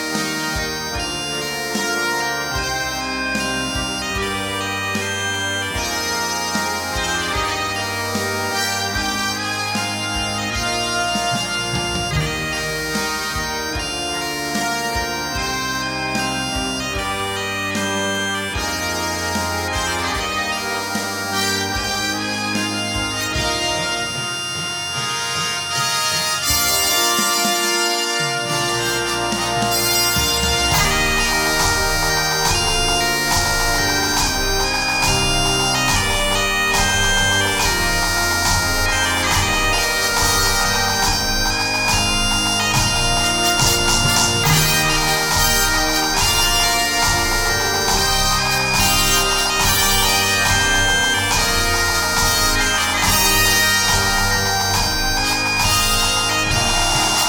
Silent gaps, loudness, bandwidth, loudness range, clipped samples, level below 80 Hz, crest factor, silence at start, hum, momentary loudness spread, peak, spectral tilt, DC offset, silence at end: none; -17 LUFS; 18 kHz; 6 LU; under 0.1%; -30 dBFS; 16 dB; 0 s; none; 7 LU; -2 dBFS; -2 dB/octave; under 0.1%; 0 s